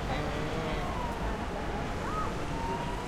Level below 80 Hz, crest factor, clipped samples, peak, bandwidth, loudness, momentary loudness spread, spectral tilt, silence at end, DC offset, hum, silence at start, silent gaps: -40 dBFS; 14 dB; under 0.1%; -20 dBFS; 16 kHz; -34 LUFS; 2 LU; -5.5 dB/octave; 0 s; under 0.1%; none; 0 s; none